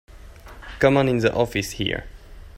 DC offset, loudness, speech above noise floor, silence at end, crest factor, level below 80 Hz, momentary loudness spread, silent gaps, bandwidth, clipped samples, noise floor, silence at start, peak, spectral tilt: under 0.1%; -21 LUFS; 21 dB; 0 s; 22 dB; -42 dBFS; 17 LU; none; 16 kHz; under 0.1%; -42 dBFS; 0.15 s; -2 dBFS; -5.5 dB/octave